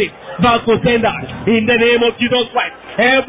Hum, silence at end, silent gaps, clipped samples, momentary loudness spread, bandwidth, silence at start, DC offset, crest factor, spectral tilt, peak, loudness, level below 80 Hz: none; 0 s; none; under 0.1%; 8 LU; 3.9 kHz; 0 s; under 0.1%; 14 dB; -9 dB/octave; -2 dBFS; -14 LUFS; -42 dBFS